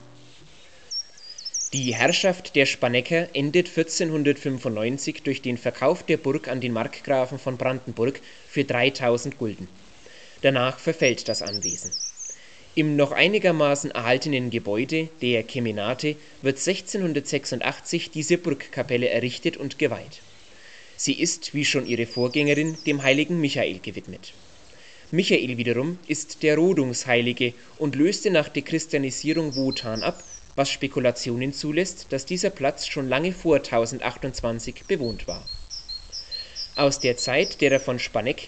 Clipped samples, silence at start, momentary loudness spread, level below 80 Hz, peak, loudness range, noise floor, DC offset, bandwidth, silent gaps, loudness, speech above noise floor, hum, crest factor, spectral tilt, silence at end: under 0.1%; 0 s; 11 LU; -52 dBFS; -2 dBFS; 3 LU; -51 dBFS; 0.4%; 9.2 kHz; none; -24 LUFS; 27 dB; none; 22 dB; -4 dB/octave; 0 s